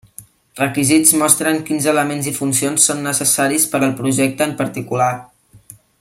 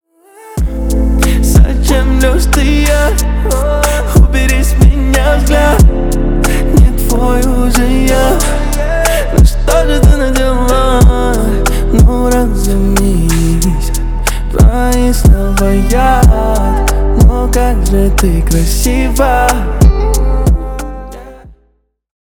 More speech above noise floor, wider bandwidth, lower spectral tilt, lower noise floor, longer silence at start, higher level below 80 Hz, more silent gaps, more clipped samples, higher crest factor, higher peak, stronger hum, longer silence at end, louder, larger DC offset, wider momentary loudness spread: second, 28 dB vs 47 dB; second, 16.5 kHz vs 18.5 kHz; second, -3.5 dB/octave vs -5.5 dB/octave; second, -44 dBFS vs -56 dBFS; second, 0.2 s vs 0.45 s; second, -58 dBFS vs -10 dBFS; neither; neither; first, 18 dB vs 8 dB; about the same, 0 dBFS vs 0 dBFS; neither; about the same, 0.75 s vs 0.75 s; second, -15 LUFS vs -11 LUFS; neither; first, 9 LU vs 5 LU